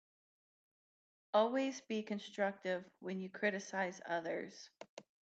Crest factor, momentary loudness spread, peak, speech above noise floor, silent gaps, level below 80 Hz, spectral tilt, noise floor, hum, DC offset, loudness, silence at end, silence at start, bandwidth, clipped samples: 20 dB; 17 LU; -20 dBFS; over 51 dB; 4.89-4.97 s; under -90 dBFS; -4.5 dB/octave; under -90 dBFS; none; under 0.1%; -39 LUFS; 0.2 s; 1.35 s; 8.2 kHz; under 0.1%